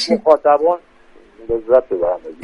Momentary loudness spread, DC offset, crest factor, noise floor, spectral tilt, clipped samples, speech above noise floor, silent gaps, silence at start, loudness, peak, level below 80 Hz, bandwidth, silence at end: 11 LU; under 0.1%; 16 dB; -45 dBFS; -4.5 dB/octave; under 0.1%; 30 dB; none; 0 s; -16 LUFS; 0 dBFS; -48 dBFS; 11 kHz; 0.1 s